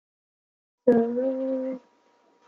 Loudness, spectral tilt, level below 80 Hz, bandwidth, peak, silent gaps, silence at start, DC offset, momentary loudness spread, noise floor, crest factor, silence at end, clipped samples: -25 LUFS; -9.5 dB/octave; -74 dBFS; 4.5 kHz; -6 dBFS; none; 0.85 s; under 0.1%; 12 LU; -63 dBFS; 22 dB; 0.7 s; under 0.1%